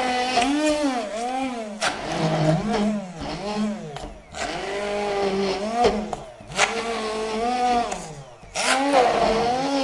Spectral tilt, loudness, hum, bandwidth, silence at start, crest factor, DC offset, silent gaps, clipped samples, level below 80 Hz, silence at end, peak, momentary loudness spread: -4 dB/octave; -23 LUFS; none; 11.5 kHz; 0 s; 20 dB; under 0.1%; none; under 0.1%; -48 dBFS; 0 s; -4 dBFS; 12 LU